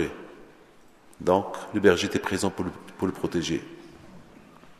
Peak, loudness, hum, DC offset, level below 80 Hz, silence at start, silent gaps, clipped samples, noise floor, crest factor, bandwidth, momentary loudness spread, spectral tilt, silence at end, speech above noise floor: -6 dBFS; -26 LUFS; none; under 0.1%; -56 dBFS; 0 s; none; under 0.1%; -54 dBFS; 24 dB; 13.5 kHz; 23 LU; -5 dB/octave; 0.05 s; 28 dB